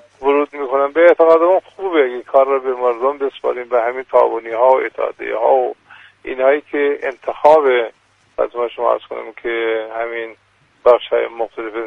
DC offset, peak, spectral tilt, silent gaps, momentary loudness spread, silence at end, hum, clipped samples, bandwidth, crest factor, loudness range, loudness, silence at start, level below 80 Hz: under 0.1%; 0 dBFS; -5 dB/octave; none; 12 LU; 0 s; none; under 0.1%; 5.6 kHz; 16 dB; 4 LU; -16 LUFS; 0.2 s; -58 dBFS